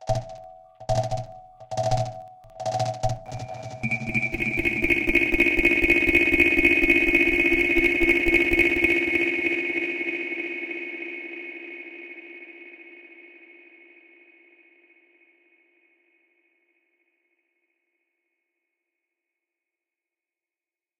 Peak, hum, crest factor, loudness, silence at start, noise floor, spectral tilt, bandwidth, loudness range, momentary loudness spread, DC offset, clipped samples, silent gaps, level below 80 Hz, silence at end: -4 dBFS; none; 22 dB; -21 LUFS; 0 s; under -90 dBFS; -5.5 dB/octave; 17 kHz; 18 LU; 22 LU; under 0.1%; under 0.1%; none; -42 dBFS; 7.75 s